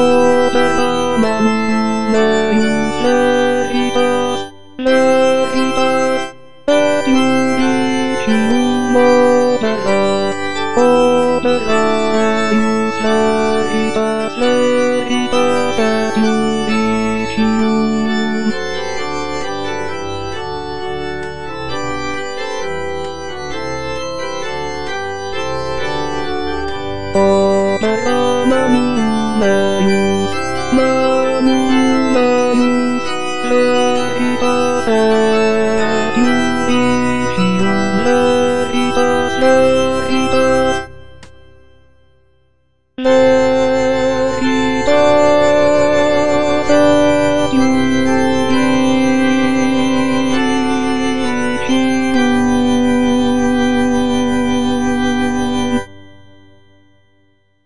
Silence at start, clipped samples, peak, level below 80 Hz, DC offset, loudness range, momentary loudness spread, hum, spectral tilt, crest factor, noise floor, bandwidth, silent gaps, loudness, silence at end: 0 s; under 0.1%; 0 dBFS; -40 dBFS; 6%; 8 LU; 10 LU; none; -5 dB/octave; 14 dB; -60 dBFS; 10 kHz; none; -14 LUFS; 0 s